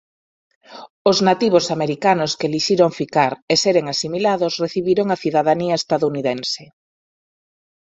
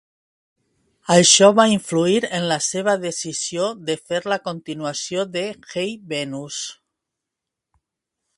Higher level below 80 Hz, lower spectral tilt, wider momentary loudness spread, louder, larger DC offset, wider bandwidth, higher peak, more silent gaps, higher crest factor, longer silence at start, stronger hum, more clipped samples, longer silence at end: about the same, -60 dBFS vs -64 dBFS; first, -4.5 dB/octave vs -3 dB/octave; second, 6 LU vs 16 LU; about the same, -18 LUFS vs -19 LUFS; neither; second, 8.4 kHz vs 11.5 kHz; about the same, 0 dBFS vs 0 dBFS; first, 0.90-1.05 s, 3.42-3.48 s vs none; about the same, 18 dB vs 22 dB; second, 0.7 s vs 1.1 s; neither; neither; second, 1.2 s vs 1.65 s